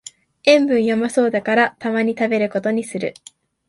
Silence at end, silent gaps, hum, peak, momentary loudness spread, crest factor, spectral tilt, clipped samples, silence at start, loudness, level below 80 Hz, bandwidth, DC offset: 0.55 s; none; none; 0 dBFS; 8 LU; 18 dB; -4.5 dB/octave; under 0.1%; 0.45 s; -18 LUFS; -64 dBFS; 11.5 kHz; under 0.1%